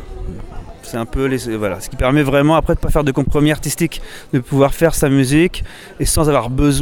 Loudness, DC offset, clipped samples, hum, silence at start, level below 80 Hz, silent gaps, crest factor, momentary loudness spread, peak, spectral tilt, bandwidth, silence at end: -16 LUFS; under 0.1%; under 0.1%; none; 0 s; -26 dBFS; none; 16 dB; 18 LU; 0 dBFS; -5.5 dB/octave; 18.5 kHz; 0 s